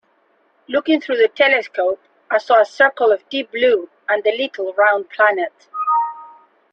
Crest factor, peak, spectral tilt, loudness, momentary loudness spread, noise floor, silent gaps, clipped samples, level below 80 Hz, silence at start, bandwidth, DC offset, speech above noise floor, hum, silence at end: 16 dB; -2 dBFS; -3.5 dB/octave; -17 LUFS; 9 LU; -60 dBFS; none; under 0.1%; -66 dBFS; 0.7 s; 7.8 kHz; under 0.1%; 43 dB; none; 0.45 s